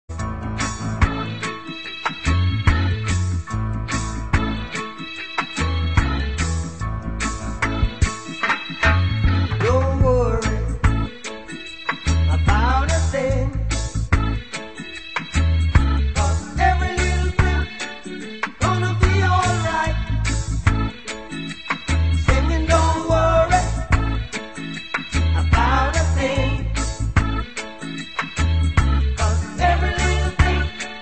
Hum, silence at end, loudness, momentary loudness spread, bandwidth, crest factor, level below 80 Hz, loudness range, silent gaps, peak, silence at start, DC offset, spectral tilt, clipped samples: none; 0 s; -21 LUFS; 11 LU; 8.8 kHz; 18 dB; -24 dBFS; 4 LU; none; 0 dBFS; 0.1 s; 0.8%; -5.5 dB/octave; under 0.1%